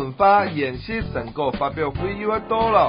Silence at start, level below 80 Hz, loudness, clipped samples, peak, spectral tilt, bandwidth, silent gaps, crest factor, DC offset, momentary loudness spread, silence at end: 0 s; -40 dBFS; -22 LUFS; under 0.1%; -4 dBFS; -11 dB/octave; 5.2 kHz; none; 16 dB; under 0.1%; 10 LU; 0 s